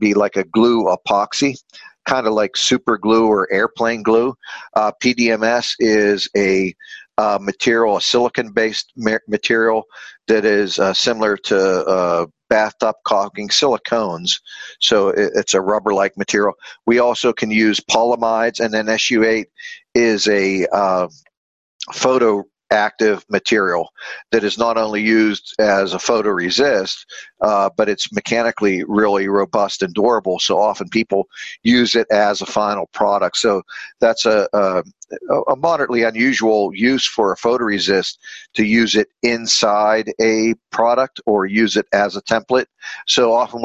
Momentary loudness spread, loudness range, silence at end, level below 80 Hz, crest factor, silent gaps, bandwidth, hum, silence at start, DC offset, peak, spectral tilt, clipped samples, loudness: 6 LU; 1 LU; 0 s; -56 dBFS; 16 dB; 21.37-21.79 s; 8.4 kHz; none; 0 s; under 0.1%; 0 dBFS; -3.5 dB/octave; under 0.1%; -16 LUFS